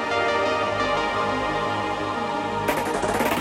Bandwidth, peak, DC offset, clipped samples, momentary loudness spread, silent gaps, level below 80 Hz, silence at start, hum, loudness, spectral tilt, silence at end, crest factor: 16.5 kHz; -10 dBFS; under 0.1%; under 0.1%; 4 LU; none; -48 dBFS; 0 s; none; -24 LUFS; -4 dB/octave; 0 s; 14 dB